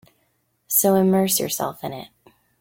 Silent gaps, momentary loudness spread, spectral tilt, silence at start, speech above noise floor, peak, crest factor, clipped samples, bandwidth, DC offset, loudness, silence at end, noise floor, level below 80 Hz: none; 16 LU; -4.5 dB/octave; 0.7 s; 48 dB; -4 dBFS; 18 dB; under 0.1%; 17 kHz; under 0.1%; -19 LUFS; 0.55 s; -68 dBFS; -62 dBFS